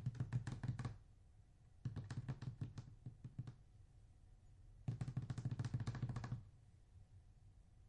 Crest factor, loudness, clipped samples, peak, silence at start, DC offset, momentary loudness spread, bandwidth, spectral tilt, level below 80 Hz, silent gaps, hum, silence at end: 18 dB; -49 LUFS; under 0.1%; -32 dBFS; 0 s; under 0.1%; 23 LU; 10.5 kHz; -7.5 dB/octave; -64 dBFS; none; none; 0 s